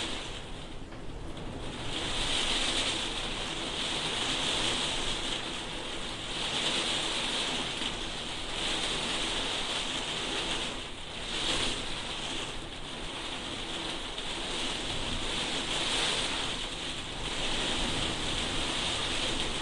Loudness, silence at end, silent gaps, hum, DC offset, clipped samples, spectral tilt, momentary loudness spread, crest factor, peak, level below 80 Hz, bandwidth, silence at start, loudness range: -31 LUFS; 0 s; none; none; under 0.1%; under 0.1%; -2 dB/octave; 10 LU; 16 dB; -16 dBFS; -44 dBFS; 11.5 kHz; 0 s; 4 LU